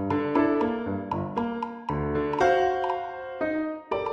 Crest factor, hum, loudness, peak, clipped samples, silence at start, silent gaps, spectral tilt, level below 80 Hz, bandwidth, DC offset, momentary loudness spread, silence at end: 16 dB; none; -27 LUFS; -10 dBFS; under 0.1%; 0 s; none; -7 dB/octave; -48 dBFS; 8.4 kHz; under 0.1%; 9 LU; 0 s